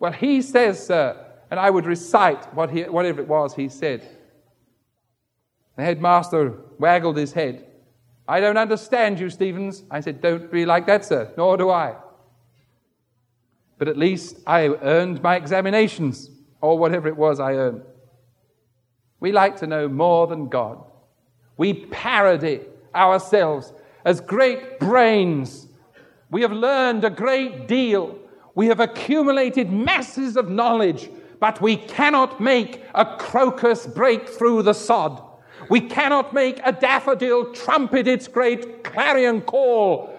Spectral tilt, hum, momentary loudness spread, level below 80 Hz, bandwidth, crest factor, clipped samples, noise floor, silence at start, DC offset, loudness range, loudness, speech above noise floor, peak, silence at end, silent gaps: -6 dB/octave; none; 10 LU; -66 dBFS; 11 kHz; 18 dB; under 0.1%; -74 dBFS; 0 s; under 0.1%; 4 LU; -20 LUFS; 55 dB; -2 dBFS; 0 s; none